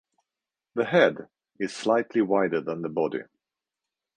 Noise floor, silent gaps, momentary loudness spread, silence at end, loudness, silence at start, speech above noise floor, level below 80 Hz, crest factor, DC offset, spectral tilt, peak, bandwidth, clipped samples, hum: -89 dBFS; none; 13 LU; 0.95 s; -26 LUFS; 0.75 s; 64 dB; -72 dBFS; 20 dB; under 0.1%; -5.5 dB/octave; -6 dBFS; 10 kHz; under 0.1%; none